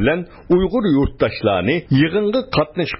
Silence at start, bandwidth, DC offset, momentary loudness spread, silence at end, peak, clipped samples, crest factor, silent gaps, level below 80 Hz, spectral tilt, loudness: 0 s; 5.8 kHz; under 0.1%; 3 LU; 0 s; -4 dBFS; under 0.1%; 14 dB; none; -34 dBFS; -11.5 dB/octave; -18 LUFS